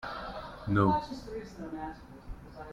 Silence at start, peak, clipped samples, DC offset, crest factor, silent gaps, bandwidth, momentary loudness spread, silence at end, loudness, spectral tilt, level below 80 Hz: 0 s; -14 dBFS; under 0.1%; under 0.1%; 20 dB; none; 11.5 kHz; 22 LU; 0 s; -33 LUFS; -8 dB/octave; -50 dBFS